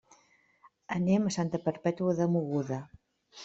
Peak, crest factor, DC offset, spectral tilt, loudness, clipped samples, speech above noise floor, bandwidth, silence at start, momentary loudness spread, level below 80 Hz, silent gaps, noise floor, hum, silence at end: -14 dBFS; 18 dB; under 0.1%; -7.5 dB/octave; -31 LUFS; under 0.1%; 37 dB; 8 kHz; 0.65 s; 9 LU; -68 dBFS; none; -66 dBFS; none; 0 s